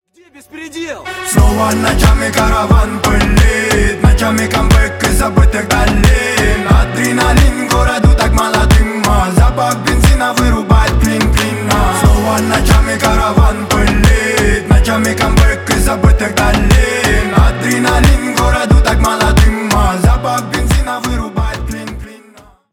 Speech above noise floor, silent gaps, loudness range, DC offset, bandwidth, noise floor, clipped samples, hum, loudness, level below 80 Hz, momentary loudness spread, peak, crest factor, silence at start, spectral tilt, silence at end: 32 dB; none; 1 LU; under 0.1%; 17 kHz; -42 dBFS; under 0.1%; none; -11 LUFS; -14 dBFS; 5 LU; 0 dBFS; 10 dB; 0.55 s; -5 dB/octave; 0.55 s